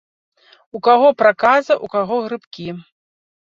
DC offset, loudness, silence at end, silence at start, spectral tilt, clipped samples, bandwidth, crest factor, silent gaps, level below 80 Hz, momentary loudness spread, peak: under 0.1%; -15 LUFS; 0.8 s; 0.75 s; -5.5 dB/octave; under 0.1%; 7.4 kHz; 16 dB; 2.47-2.51 s; -64 dBFS; 18 LU; -2 dBFS